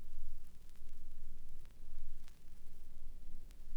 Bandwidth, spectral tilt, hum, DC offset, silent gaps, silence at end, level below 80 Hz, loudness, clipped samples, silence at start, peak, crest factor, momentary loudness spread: 0.6 kHz; -5.5 dB/octave; none; under 0.1%; none; 0 s; -44 dBFS; -58 LUFS; under 0.1%; 0 s; -26 dBFS; 10 dB; 6 LU